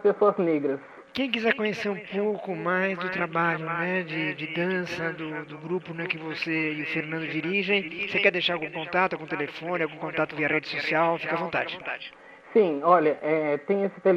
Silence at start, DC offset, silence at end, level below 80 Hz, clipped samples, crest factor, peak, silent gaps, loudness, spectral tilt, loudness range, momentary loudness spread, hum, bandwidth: 0 s; under 0.1%; 0 s; -70 dBFS; under 0.1%; 22 dB; -6 dBFS; none; -26 LUFS; -6.5 dB/octave; 4 LU; 9 LU; none; 7.6 kHz